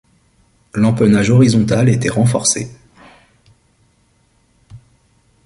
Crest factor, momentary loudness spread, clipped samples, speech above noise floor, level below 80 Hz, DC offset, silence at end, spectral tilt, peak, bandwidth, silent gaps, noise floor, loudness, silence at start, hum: 16 dB; 9 LU; under 0.1%; 45 dB; -46 dBFS; under 0.1%; 0.7 s; -5.5 dB/octave; -2 dBFS; 11.5 kHz; none; -57 dBFS; -14 LUFS; 0.75 s; none